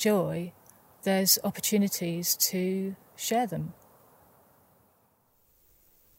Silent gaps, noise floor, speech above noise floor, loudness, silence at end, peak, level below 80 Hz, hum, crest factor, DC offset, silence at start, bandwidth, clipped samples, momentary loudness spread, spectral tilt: none; -67 dBFS; 40 dB; -27 LUFS; 2.45 s; -8 dBFS; -70 dBFS; none; 22 dB; under 0.1%; 0 s; 16.5 kHz; under 0.1%; 14 LU; -3.5 dB/octave